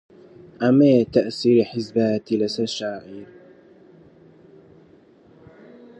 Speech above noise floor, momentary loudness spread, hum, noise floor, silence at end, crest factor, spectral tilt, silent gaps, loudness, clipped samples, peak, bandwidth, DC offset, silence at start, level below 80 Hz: 32 dB; 16 LU; none; -52 dBFS; 2.75 s; 18 dB; -6.5 dB/octave; none; -20 LUFS; under 0.1%; -4 dBFS; 8.6 kHz; under 0.1%; 0.6 s; -62 dBFS